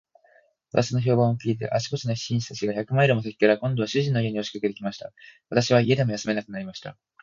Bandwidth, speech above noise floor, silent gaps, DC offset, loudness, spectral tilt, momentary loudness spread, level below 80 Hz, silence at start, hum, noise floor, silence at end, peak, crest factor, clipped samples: 7.6 kHz; 36 dB; none; under 0.1%; -24 LUFS; -6 dB/octave; 13 LU; -60 dBFS; 0.75 s; none; -60 dBFS; 0.3 s; -4 dBFS; 20 dB; under 0.1%